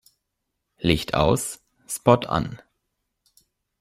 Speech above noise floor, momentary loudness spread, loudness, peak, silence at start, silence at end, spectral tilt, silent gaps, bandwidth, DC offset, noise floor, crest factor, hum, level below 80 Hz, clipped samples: 58 dB; 15 LU; -23 LUFS; -2 dBFS; 0.8 s; 1.25 s; -5 dB/octave; none; 16 kHz; under 0.1%; -79 dBFS; 24 dB; none; -44 dBFS; under 0.1%